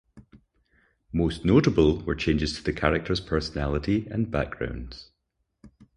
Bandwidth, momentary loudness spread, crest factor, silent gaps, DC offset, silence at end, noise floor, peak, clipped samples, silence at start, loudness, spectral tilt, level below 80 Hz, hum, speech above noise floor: 11 kHz; 12 LU; 24 dB; none; under 0.1%; 0.3 s; -77 dBFS; -4 dBFS; under 0.1%; 0.15 s; -25 LUFS; -6.5 dB/octave; -38 dBFS; none; 52 dB